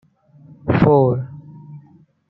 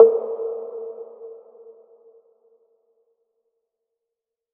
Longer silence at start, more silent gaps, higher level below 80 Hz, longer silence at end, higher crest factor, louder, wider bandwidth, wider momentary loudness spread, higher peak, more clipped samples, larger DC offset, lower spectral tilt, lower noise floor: first, 0.65 s vs 0 s; neither; first, -46 dBFS vs under -90 dBFS; second, 0.5 s vs 3.15 s; second, 18 dB vs 24 dB; first, -16 LUFS vs -24 LUFS; first, 5.6 kHz vs 1.6 kHz; about the same, 25 LU vs 24 LU; about the same, -2 dBFS vs 0 dBFS; neither; neither; first, -11 dB/octave vs -7.5 dB/octave; second, -50 dBFS vs -85 dBFS